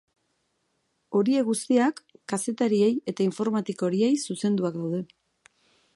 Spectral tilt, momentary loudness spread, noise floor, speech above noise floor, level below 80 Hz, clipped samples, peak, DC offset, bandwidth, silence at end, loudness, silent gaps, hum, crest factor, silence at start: -5.5 dB/octave; 9 LU; -74 dBFS; 49 dB; -76 dBFS; under 0.1%; -10 dBFS; under 0.1%; 11.5 kHz; 0.9 s; -26 LUFS; none; none; 16 dB; 1.1 s